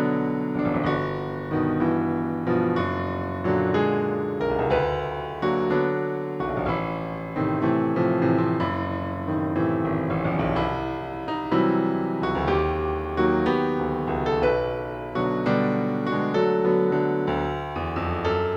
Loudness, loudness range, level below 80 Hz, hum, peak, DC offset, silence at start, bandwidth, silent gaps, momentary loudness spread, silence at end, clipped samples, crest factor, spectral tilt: -25 LUFS; 2 LU; -44 dBFS; none; -8 dBFS; under 0.1%; 0 s; 7 kHz; none; 7 LU; 0 s; under 0.1%; 14 dB; -8.5 dB/octave